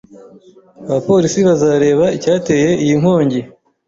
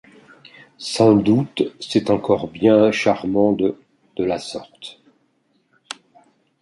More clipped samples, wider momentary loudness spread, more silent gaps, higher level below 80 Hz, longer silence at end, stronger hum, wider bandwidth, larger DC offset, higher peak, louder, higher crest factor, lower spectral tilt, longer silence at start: neither; second, 8 LU vs 21 LU; neither; first, -50 dBFS vs -56 dBFS; second, 0.4 s vs 1.7 s; neither; second, 7.8 kHz vs 11.5 kHz; neither; about the same, -2 dBFS vs -2 dBFS; first, -13 LUFS vs -18 LUFS; second, 12 dB vs 18 dB; about the same, -6 dB/octave vs -6 dB/octave; about the same, 0.8 s vs 0.8 s